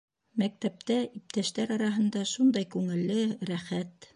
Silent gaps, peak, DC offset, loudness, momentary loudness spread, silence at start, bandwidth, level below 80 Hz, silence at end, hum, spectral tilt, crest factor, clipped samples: none; -16 dBFS; under 0.1%; -30 LUFS; 9 LU; 0.35 s; 10.5 kHz; -74 dBFS; 0.25 s; none; -5.5 dB/octave; 14 dB; under 0.1%